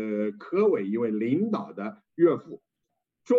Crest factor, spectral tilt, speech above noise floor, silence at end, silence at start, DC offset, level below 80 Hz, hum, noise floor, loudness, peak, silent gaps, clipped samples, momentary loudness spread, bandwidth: 16 dB; -9 dB/octave; 56 dB; 0 s; 0 s; under 0.1%; -82 dBFS; none; -82 dBFS; -26 LUFS; -10 dBFS; none; under 0.1%; 13 LU; 7.2 kHz